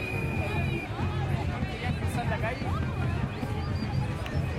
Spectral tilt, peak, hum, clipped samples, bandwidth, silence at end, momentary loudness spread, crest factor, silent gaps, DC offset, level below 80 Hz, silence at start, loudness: -7 dB/octave; -16 dBFS; none; under 0.1%; 14.5 kHz; 0 s; 2 LU; 14 dB; none; under 0.1%; -42 dBFS; 0 s; -31 LUFS